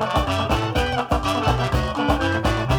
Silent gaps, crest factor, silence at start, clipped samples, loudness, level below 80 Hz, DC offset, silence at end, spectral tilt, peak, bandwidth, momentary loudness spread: none; 14 dB; 0 s; under 0.1%; -21 LUFS; -30 dBFS; under 0.1%; 0 s; -5.5 dB/octave; -6 dBFS; 19.5 kHz; 2 LU